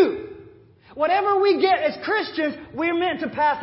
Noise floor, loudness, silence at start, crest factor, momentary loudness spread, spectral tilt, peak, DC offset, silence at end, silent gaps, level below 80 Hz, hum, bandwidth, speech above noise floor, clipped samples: -49 dBFS; -22 LUFS; 0 s; 16 dB; 9 LU; -8.5 dB/octave; -6 dBFS; under 0.1%; 0 s; none; -58 dBFS; none; 5.8 kHz; 28 dB; under 0.1%